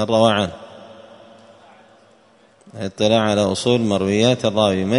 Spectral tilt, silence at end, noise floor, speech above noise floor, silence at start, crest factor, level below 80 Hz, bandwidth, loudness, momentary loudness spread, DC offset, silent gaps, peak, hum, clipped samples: -5.5 dB/octave; 0 s; -53 dBFS; 36 dB; 0 s; 20 dB; -56 dBFS; 11 kHz; -18 LUFS; 15 LU; under 0.1%; none; 0 dBFS; none; under 0.1%